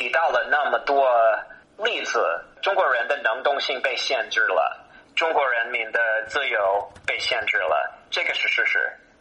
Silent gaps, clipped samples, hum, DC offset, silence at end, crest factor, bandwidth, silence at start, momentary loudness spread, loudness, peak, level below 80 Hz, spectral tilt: none; under 0.1%; none; under 0.1%; 0.25 s; 14 dB; 9.4 kHz; 0 s; 7 LU; -22 LUFS; -8 dBFS; -64 dBFS; -1 dB/octave